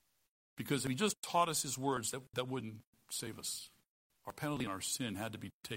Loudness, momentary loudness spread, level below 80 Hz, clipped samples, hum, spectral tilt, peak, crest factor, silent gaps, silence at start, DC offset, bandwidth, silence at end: -38 LUFS; 16 LU; -72 dBFS; under 0.1%; none; -3.5 dB/octave; -20 dBFS; 20 dB; 1.17-1.22 s, 2.86-2.93 s, 3.88-4.10 s, 5.53-5.61 s; 0.55 s; under 0.1%; 16 kHz; 0 s